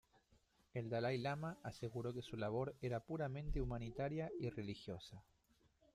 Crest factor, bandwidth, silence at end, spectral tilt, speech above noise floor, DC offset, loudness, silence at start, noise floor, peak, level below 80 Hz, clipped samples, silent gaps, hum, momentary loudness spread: 16 dB; 13.5 kHz; 0.75 s; -7 dB/octave; 32 dB; under 0.1%; -45 LUFS; 0.75 s; -76 dBFS; -30 dBFS; -56 dBFS; under 0.1%; none; none; 9 LU